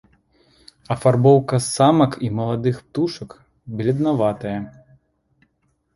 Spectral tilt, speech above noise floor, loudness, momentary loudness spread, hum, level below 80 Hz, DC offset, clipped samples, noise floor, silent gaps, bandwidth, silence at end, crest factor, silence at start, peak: -6.5 dB/octave; 49 dB; -19 LUFS; 16 LU; none; -54 dBFS; under 0.1%; under 0.1%; -67 dBFS; none; 11.5 kHz; 1.25 s; 18 dB; 0.9 s; -2 dBFS